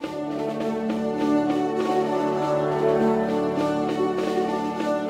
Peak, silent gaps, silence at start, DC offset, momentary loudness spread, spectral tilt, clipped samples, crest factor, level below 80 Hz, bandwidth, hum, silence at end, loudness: -10 dBFS; none; 0 s; under 0.1%; 5 LU; -6.5 dB/octave; under 0.1%; 14 dB; -58 dBFS; 14 kHz; none; 0 s; -24 LUFS